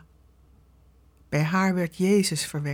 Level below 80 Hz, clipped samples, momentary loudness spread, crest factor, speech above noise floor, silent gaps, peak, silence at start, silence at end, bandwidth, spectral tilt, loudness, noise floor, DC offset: -58 dBFS; under 0.1%; 6 LU; 16 dB; 33 dB; none; -12 dBFS; 1.3 s; 0 s; 17.5 kHz; -5 dB/octave; -24 LUFS; -57 dBFS; under 0.1%